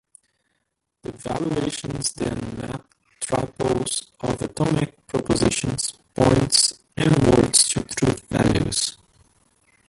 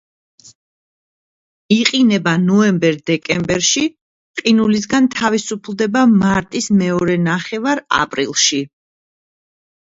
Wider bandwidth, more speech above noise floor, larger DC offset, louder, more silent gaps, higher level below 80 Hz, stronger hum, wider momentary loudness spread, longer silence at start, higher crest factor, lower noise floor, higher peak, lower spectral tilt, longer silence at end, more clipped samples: first, 12 kHz vs 8 kHz; second, 51 dB vs over 75 dB; neither; second, -21 LUFS vs -15 LUFS; second, none vs 4.01-4.34 s; first, -42 dBFS vs -52 dBFS; neither; first, 14 LU vs 8 LU; second, 1.1 s vs 1.7 s; first, 22 dB vs 16 dB; second, -76 dBFS vs under -90 dBFS; about the same, -2 dBFS vs 0 dBFS; about the same, -4 dB/octave vs -4 dB/octave; second, 1 s vs 1.35 s; neither